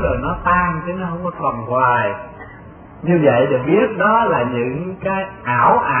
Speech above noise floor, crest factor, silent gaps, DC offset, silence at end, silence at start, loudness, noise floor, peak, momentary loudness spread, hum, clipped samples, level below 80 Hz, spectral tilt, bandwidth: 22 dB; 16 dB; none; under 0.1%; 0 s; 0 s; -17 LUFS; -38 dBFS; 0 dBFS; 10 LU; none; under 0.1%; -38 dBFS; -12 dB/octave; 3.4 kHz